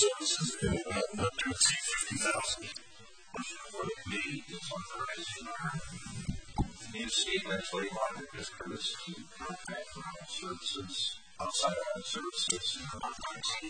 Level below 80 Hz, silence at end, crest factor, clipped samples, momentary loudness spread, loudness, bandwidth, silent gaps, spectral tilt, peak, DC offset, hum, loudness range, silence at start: -54 dBFS; 0 s; 24 dB; under 0.1%; 11 LU; -35 LUFS; 9.6 kHz; none; -2.5 dB/octave; -12 dBFS; 0.1%; none; 7 LU; 0 s